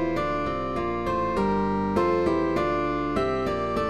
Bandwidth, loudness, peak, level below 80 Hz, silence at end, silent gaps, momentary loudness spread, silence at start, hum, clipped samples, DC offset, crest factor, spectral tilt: 12 kHz; -25 LUFS; -10 dBFS; -42 dBFS; 0 s; none; 4 LU; 0 s; none; under 0.1%; 0.6%; 14 dB; -7.5 dB/octave